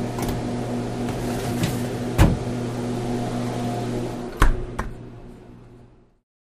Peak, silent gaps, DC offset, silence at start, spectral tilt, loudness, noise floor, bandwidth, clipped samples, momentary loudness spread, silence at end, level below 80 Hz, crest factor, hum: -2 dBFS; none; under 0.1%; 0 s; -6 dB/octave; -25 LUFS; -50 dBFS; 15.5 kHz; under 0.1%; 18 LU; 0.7 s; -30 dBFS; 22 dB; none